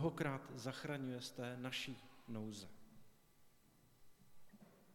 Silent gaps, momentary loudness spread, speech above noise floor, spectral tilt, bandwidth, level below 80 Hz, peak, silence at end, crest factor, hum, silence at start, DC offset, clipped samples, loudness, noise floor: none; 22 LU; 25 dB; -5 dB/octave; 18 kHz; -76 dBFS; -26 dBFS; 0 s; 22 dB; none; 0 s; under 0.1%; under 0.1%; -47 LUFS; -70 dBFS